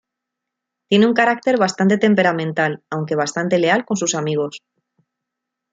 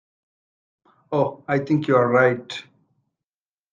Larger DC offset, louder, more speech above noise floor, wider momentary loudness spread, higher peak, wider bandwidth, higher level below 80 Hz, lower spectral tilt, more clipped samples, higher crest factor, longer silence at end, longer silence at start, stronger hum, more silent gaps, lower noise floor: neither; first, -18 LUFS vs -21 LUFS; second, 64 dB vs over 70 dB; second, 7 LU vs 14 LU; about the same, -2 dBFS vs -4 dBFS; first, 9.4 kHz vs 7.6 kHz; about the same, -66 dBFS vs -68 dBFS; second, -4.5 dB/octave vs -7.5 dB/octave; neither; about the same, 18 dB vs 20 dB; about the same, 1.15 s vs 1.1 s; second, 0.9 s vs 1.1 s; neither; neither; second, -82 dBFS vs under -90 dBFS